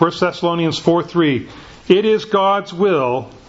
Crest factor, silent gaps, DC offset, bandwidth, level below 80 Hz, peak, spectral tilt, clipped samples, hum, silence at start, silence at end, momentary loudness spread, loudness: 16 dB; none; under 0.1%; 8 kHz; -52 dBFS; 0 dBFS; -6.5 dB/octave; under 0.1%; none; 0 s; 0.2 s; 6 LU; -16 LUFS